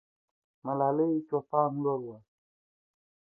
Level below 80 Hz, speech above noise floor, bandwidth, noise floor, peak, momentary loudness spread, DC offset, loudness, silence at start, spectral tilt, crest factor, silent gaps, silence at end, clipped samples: -80 dBFS; over 61 dB; 2.1 kHz; under -90 dBFS; -12 dBFS; 11 LU; under 0.1%; -30 LUFS; 0.65 s; -13.5 dB/octave; 20 dB; none; 1.15 s; under 0.1%